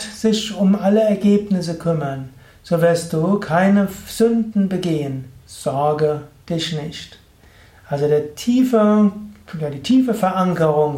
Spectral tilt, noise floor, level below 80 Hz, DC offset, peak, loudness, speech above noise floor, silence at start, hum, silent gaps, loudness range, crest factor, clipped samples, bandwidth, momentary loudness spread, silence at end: -6.5 dB/octave; -48 dBFS; -52 dBFS; under 0.1%; -4 dBFS; -18 LUFS; 31 dB; 0 s; none; none; 5 LU; 14 dB; under 0.1%; 16 kHz; 13 LU; 0 s